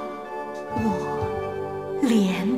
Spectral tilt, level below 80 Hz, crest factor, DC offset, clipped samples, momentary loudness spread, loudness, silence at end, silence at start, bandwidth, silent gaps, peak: -6.5 dB/octave; -52 dBFS; 16 dB; 0.2%; under 0.1%; 12 LU; -26 LUFS; 0 s; 0 s; 15.5 kHz; none; -10 dBFS